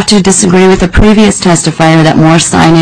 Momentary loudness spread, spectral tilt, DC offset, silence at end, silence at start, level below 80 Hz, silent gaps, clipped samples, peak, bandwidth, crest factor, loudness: 2 LU; -4.5 dB/octave; under 0.1%; 0 s; 0 s; -20 dBFS; none; 2%; 0 dBFS; 11 kHz; 6 dB; -5 LUFS